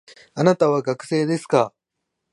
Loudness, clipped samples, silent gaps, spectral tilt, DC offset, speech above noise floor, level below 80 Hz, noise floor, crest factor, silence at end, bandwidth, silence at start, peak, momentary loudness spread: -20 LUFS; under 0.1%; none; -6.5 dB/octave; under 0.1%; 60 dB; -70 dBFS; -80 dBFS; 20 dB; 0.65 s; 11.5 kHz; 0.35 s; -2 dBFS; 8 LU